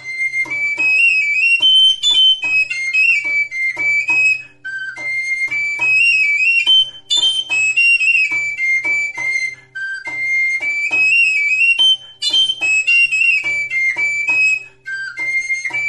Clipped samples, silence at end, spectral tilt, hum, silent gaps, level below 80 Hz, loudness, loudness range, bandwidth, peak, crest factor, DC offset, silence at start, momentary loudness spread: under 0.1%; 0 s; 2 dB/octave; none; none; -60 dBFS; -12 LUFS; 4 LU; 11.5 kHz; -4 dBFS; 10 dB; under 0.1%; 0 s; 10 LU